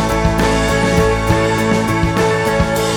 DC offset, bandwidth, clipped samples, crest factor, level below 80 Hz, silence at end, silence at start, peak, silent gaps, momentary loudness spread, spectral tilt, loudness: under 0.1%; 19 kHz; under 0.1%; 14 dB; -24 dBFS; 0 s; 0 s; 0 dBFS; none; 2 LU; -5.5 dB/octave; -15 LUFS